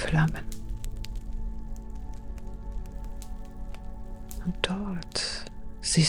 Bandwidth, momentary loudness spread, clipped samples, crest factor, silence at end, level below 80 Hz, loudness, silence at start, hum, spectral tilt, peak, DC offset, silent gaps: 16 kHz; 15 LU; under 0.1%; 26 dB; 0 s; -36 dBFS; -35 LUFS; 0 s; none; -4 dB/octave; -6 dBFS; under 0.1%; none